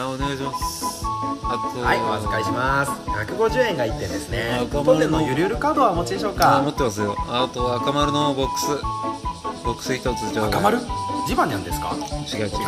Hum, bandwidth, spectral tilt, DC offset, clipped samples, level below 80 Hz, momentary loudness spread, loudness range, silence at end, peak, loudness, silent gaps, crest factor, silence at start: none; 14 kHz; -5 dB/octave; under 0.1%; under 0.1%; -36 dBFS; 8 LU; 3 LU; 0 s; -4 dBFS; -22 LUFS; none; 18 dB; 0 s